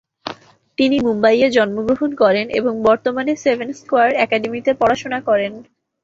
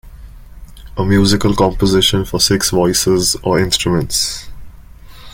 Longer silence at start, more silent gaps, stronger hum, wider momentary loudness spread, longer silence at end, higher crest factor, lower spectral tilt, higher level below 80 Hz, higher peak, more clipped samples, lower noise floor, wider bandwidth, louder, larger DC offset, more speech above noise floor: first, 0.25 s vs 0.05 s; neither; neither; first, 10 LU vs 5 LU; first, 0.4 s vs 0.05 s; about the same, 16 dB vs 16 dB; about the same, -5 dB/octave vs -4 dB/octave; second, -54 dBFS vs -32 dBFS; about the same, -2 dBFS vs 0 dBFS; neither; about the same, -38 dBFS vs -36 dBFS; second, 7.8 kHz vs 17 kHz; second, -17 LUFS vs -14 LUFS; neither; about the same, 21 dB vs 22 dB